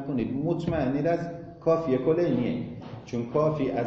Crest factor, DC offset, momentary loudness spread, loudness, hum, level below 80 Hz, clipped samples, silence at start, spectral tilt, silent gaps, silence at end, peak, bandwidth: 14 dB; under 0.1%; 10 LU; -27 LUFS; none; -52 dBFS; under 0.1%; 0 s; -8.5 dB/octave; none; 0 s; -12 dBFS; 7.6 kHz